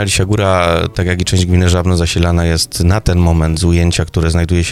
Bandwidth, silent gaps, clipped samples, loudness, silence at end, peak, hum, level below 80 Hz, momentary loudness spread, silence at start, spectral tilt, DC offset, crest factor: 14 kHz; none; under 0.1%; -13 LUFS; 0 s; 0 dBFS; none; -22 dBFS; 3 LU; 0 s; -5 dB/octave; under 0.1%; 12 dB